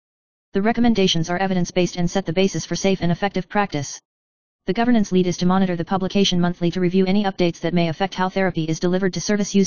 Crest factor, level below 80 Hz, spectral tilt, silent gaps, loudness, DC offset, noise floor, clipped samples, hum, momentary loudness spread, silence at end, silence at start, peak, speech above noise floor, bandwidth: 18 dB; -48 dBFS; -5.5 dB/octave; 4.05-4.59 s; -20 LUFS; 2%; under -90 dBFS; under 0.1%; none; 5 LU; 0 s; 0.5 s; -2 dBFS; over 70 dB; 7.2 kHz